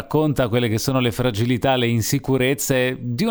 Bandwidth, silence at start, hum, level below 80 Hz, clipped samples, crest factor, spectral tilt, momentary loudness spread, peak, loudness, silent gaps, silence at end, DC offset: over 20 kHz; 0 s; none; -44 dBFS; under 0.1%; 14 dB; -5 dB/octave; 2 LU; -6 dBFS; -20 LUFS; none; 0 s; under 0.1%